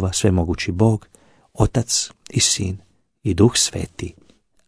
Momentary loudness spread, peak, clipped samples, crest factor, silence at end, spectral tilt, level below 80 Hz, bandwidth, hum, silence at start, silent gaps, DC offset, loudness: 13 LU; -2 dBFS; under 0.1%; 20 dB; 0.55 s; -4 dB/octave; -38 dBFS; 11 kHz; none; 0 s; none; under 0.1%; -19 LUFS